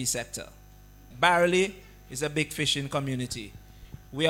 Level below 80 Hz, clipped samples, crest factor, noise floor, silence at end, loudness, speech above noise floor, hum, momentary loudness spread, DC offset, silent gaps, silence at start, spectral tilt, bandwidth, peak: -52 dBFS; under 0.1%; 22 dB; -51 dBFS; 0 s; -27 LUFS; 23 dB; 50 Hz at -50 dBFS; 17 LU; under 0.1%; none; 0 s; -3.5 dB/octave; 17 kHz; -6 dBFS